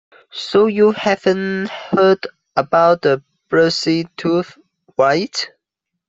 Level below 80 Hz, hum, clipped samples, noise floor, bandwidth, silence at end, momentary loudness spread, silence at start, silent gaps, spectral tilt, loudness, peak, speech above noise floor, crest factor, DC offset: -60 dBFS; none; under 0.1%; -79 dBFS; 8 kHz; 0.6 s; 10 LU; 0.35 s; none; -5.5 dB/octave; -16 LUFS; 0 dBFS; 64 dB; 16 dB; under 0.1%